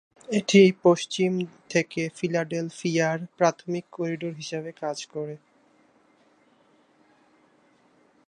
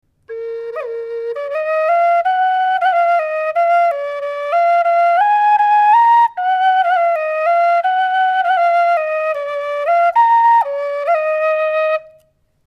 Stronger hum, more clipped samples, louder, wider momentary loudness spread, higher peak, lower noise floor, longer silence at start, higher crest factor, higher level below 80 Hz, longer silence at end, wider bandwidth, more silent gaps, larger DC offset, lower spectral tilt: neither; neither; second, -25 LUFS vs -15 LUFS; first, 15 LU vs 11 LU; about the same, -4 dBFS vs -4 dBFS; first, -62 dBFS vs -55 dBFS; about the same, 0.3 s vs 0.3 s; first, 22 dB vs 10 dB; second, -74 dBFS vs -66 dBFS; first, 2.9 s vs 0.65 s; first, 11 kHz vs 6.2 kHz; neither; neither; first, -5.5 dB/octave vs -1 dB/octave